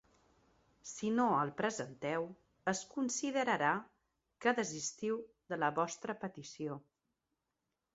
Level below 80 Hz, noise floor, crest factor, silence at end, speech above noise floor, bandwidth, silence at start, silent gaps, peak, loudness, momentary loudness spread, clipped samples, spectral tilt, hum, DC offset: -78 dBFS; -88 dBFS; 22 dB; 1.15 s; 51 dB; 8 kHz; 0.85 s; none; -16 dBFS; -37 LUFS; 12 LU; under 0.1%; -4 dB/octave; none; under 0.1%